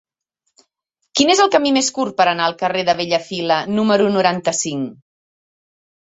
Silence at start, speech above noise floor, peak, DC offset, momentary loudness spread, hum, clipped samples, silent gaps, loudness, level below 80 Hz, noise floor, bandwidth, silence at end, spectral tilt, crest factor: 1.15 s; 57 dB; -2 dBFS; under 0.1%; 8 LU; none; under 0.1%; none; -17 LUFS; -62 dBFS; -74 dBFS; 8.4 kHz; 1.2 s; -3.5 dB/octave; 18 dB